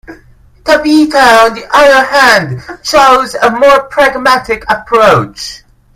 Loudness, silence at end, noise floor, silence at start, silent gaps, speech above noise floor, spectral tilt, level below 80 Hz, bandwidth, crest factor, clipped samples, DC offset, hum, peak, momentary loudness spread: -7 LUFS; 0.4 s; -41 dBFS; 0.1 s; none; 33 dB; -4 dB/octave; -38 dBFS; 16.5 kHz; 8 dB; 2%; under 0.1%; none; 0 dBFS; 13 LU